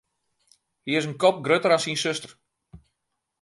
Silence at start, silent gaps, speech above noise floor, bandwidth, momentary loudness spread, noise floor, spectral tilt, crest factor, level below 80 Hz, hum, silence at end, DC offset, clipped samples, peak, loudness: 0.85 s; none; 57 dB; 11.5 kHz; 14 LU; -80 dBFS; -4 dB/octave; 20 dB; -64 dBFS; none; 0.65 s; under 0.1%; under 0.1%; -6 dBFS; -23 LUFS